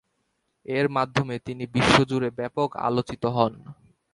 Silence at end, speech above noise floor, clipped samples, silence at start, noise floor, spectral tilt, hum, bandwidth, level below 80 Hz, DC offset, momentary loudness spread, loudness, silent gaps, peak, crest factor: 0.4 s; 50 dB; under 0.1%; 0.7 s; -74 dBFS; -5.5 dB/octave; none; 11.5 kHz; -50 dBFS; under 0.1%; 11 LU; -24 LUFS; none; -2 dBFS; 22 dB